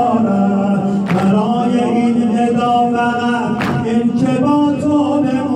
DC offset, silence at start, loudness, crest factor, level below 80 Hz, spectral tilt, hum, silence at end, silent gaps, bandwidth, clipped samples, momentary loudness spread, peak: under 0.1%; 0 s; -14 LUFS; 10 dB; -52 dBFS; -7.5 dB/octave; none; 0 s; none; 9.8 kHz; under 0.1%; 3 LU; -4 dBFS